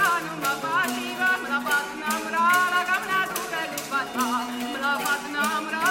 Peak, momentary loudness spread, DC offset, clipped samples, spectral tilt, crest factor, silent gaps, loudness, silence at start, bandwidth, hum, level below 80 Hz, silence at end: -10 dBFS; 7 LU; under 0.1%; under 0.1%; -2 dB/octave; 16 dB; none; -24 LUFS; 0 s; 17 kHz; none; -64 dBFS; 0 s